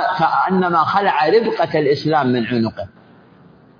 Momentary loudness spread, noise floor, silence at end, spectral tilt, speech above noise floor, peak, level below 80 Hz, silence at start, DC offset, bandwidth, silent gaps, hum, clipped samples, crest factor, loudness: 6 LU; -47 dBFS; 0.9 s; -7.5 dB/octave; 31 dB; -2 dBFS; -58 dBFS; 0 s; under 0.1%; 5.2 kHz; none; none; under 0.1%; 14 dB; -16 LUFS